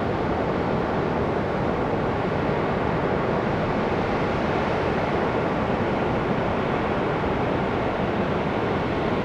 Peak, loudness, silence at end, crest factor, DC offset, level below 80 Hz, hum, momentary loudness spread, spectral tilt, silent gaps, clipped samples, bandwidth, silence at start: -10 dBFS; -24 LUFS; 0 s; 14 dB; under 0.1%; -40 dBFS; none; 1 LU; -7.5 dB/octave; none; under 0.1%; 10.5 kHz; 0 s